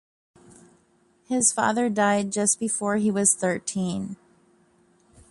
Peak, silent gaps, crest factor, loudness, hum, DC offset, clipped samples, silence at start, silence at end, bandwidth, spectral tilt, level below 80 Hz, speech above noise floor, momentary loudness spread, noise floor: -6 dBFS; none; 20 dB; -23 LUFS; none; under 0.1%; under 0.1%; 1.3 s; 1.15 s; 11.5 kHz; -3.5 dB/octave; -64 dBFS; 39 dB; 9 LU; -63 dBFS